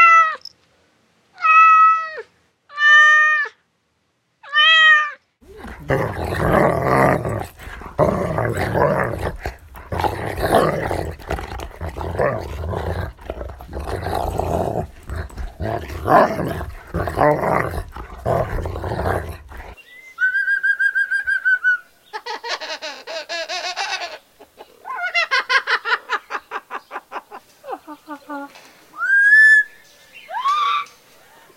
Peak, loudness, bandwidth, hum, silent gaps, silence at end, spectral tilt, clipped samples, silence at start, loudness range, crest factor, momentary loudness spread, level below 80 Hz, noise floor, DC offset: -2 dBFS; -17 LUFS; 16.5 kHz; none; none; 0.7 s; -4.5 dB/octave; under 0.1%; 0 s; 12 LU; 18 dB; 22 LU; -38 dBFS; -67 dBFS; under 0.1%